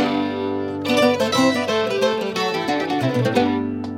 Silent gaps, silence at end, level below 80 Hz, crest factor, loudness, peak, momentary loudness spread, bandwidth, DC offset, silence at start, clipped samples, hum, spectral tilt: none; 0 s; -62 dBFS; 16 dB; -20 LUFS; -4 dBFS; 6 LU; 16.5 kHz; under 0.1%; 0 s; under 0.1%; none; -5 dB/octave